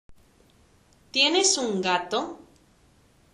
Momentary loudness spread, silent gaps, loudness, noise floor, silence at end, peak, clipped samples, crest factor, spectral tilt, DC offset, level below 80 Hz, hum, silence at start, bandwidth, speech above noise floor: 11 LU; none; -23 LUFS; -60 dBFS; 0.95 s; -8 dBFS; under 0.1%; 20 dB; -1.5 dB/octave; under 0.1%; -64 dBFS; none; 0.1 s; 11.5 kHz; 36 dB